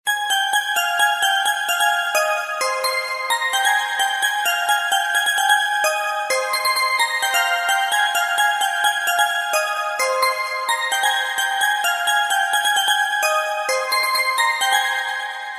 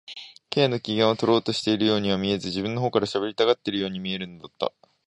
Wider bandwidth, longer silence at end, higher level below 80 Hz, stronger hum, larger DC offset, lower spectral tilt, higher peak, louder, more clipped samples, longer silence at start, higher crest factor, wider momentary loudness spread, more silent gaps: first, 14.5 kHz vs 11 kHz; second, 0 s vs 0.4 s; second, -82 dBFS vs -58 dBFS; neither; neither; second, 4 dB/octave vs -5.5 dB/octave; about the same, -4 dBFS vs -6 dBFS; first, -18 LUFS vs -24 LUFS; neither; about the same, 0.05 s vs 0.1 s; about the same, 16 dB vs 20 dB; second, 4 LU vs 9 LU; neither